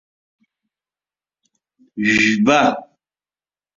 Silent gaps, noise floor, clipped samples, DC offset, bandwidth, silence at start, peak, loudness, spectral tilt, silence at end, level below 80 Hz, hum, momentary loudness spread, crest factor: none; under -90 dBFS; under 0.1%; under 0.1%; 7.8 kHz; 1.95 s; -2 dBFS; -15 LUFS; -4.5 dB/octave; 0.9 s; -58 dBFS; none; 16 LU; 20 dB